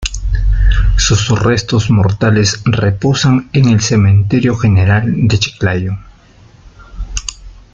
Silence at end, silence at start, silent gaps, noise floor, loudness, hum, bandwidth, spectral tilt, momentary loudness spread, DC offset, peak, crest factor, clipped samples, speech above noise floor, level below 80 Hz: 0.15 s; 0 s; none; -42 dBFS; -12 LUFS; none; 7.8 kHz; -5.5 dB/octave; 12 LU; under 0.1%; 0 dBFS; 12 dB; under 0.1%; 31 dB; -20 dBFS